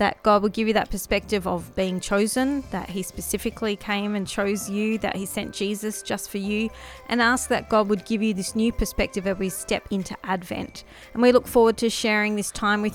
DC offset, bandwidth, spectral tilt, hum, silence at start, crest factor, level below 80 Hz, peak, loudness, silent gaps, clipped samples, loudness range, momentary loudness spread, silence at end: under 0.1%; 17 kHz; -4 dB/octave; none; 0 s; 20 dB; -42 dBFS; -4 dBFS; -24 LUFS; none; under 0.1%; 4 LU; 10 LU; 0 s